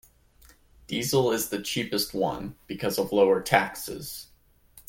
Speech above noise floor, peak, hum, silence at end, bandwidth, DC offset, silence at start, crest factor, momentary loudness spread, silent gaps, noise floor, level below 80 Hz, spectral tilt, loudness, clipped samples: 31 dB; -4 dBFS; none; 0.1 s; 17 kHz; under 0.1%; 0.9 s; 24 dB; 15 LU; none; -57 dBFS; -56 dBFS; -4 dB/octave; -26 LUFS; under 0.1%